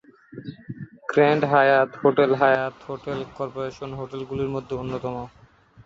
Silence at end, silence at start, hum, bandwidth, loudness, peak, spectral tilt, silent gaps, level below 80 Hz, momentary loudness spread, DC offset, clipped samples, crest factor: 0.6 s; 0.35 s; none; 7.4 kHz; -22 LUFS; -6 dBFS; -7.5 dB/octave; none; -56 dBFS; 21 LU; under 0.1%; under 0.1%; 18 dB